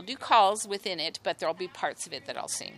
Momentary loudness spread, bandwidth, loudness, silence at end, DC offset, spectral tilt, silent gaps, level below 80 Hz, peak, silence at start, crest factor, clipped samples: 13 LU; 14.5 kHz; -29 LUFS; 0 s; under 0.1%; -1.5 dB/octave; none; -76 dBFS; -10 dBFS; 0 s; 20 dB; under 0.1%